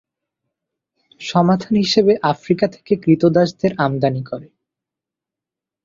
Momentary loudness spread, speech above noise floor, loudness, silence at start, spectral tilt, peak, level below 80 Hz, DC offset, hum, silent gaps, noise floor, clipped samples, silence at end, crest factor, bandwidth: 10 LU; 70 dB; -17 LUFS; 1.2 s; -6.5 dB/octave; -2 dBFS; -56 dBFS; under 0.1%; none; none; -87 dBFS; under 0.1%; 1.4 s; 18 dB; 7.6 kHz